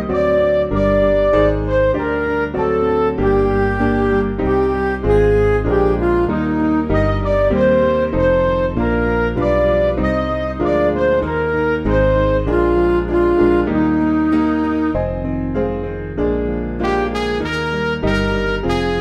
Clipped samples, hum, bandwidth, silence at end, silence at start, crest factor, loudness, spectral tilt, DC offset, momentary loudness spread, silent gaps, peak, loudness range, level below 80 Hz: under 0.1%; none; 9.6 kHz; 0 s; 0 s; 14 dB; -17 LUFS; -8 dB/octave; under 0.1%; 6 LU; none; -2 dBFS; 4 LU; -26 dBFS